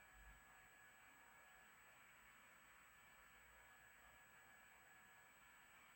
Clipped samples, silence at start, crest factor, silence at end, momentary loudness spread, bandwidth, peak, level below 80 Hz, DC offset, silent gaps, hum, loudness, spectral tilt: under 0.1%; 0 s; 14 dB; 0 s; 1 LU; over 20 kHz; -54 dBFS; -80 dBFS; under 0.1%; none; none; -66 LUFS; -1.5 dB/octave